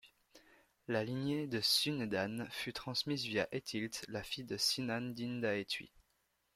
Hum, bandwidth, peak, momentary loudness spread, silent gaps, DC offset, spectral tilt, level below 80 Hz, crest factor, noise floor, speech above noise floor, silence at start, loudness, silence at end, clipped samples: none; 16.5 kHz; -18 dBFS; 10 LU; none; under 0.1%; -3.5 dB/octave; -72 dBFS; 20 dB; -79 dBFS; 41 dB; 0.05 s; -37 LUFS; 0.7 s; under 0.1%